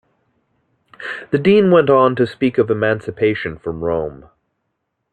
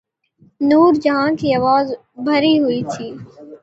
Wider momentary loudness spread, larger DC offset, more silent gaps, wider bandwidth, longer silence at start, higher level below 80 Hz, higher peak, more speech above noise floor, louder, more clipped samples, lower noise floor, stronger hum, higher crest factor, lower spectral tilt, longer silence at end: about the same, 16 LU vs 14 LU; neither; neither; about the same, 8.8 kHz vs 8 kHz; first, 1 s vs 0.6 s; about the same, -52 dBFS vs -56 dBFS; about the same, -2 dBFS vs -2 dBFS; first, 58 dB vs 38 dB; about the same, -16 LUFS vs -16 LUFS; neither; first, -73 dBFS vs -54 dBFS; neither; about the same, 16 dB vs 16 dB; first, -8.5 dB/octave vs -6 dB/octave; first, 1 s vs 0.05 s